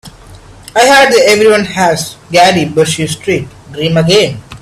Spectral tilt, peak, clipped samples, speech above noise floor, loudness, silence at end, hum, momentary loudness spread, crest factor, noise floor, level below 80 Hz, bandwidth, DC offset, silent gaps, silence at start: -4 dB/octave; 0 dBFS; 0.2%; 26 dB; -9 LUFS; 0.05 s; none; 11 LU; 10 dB; -34 dBFS; -42 dBFS; 15 kHz; under 0.1%; none; 0.05 s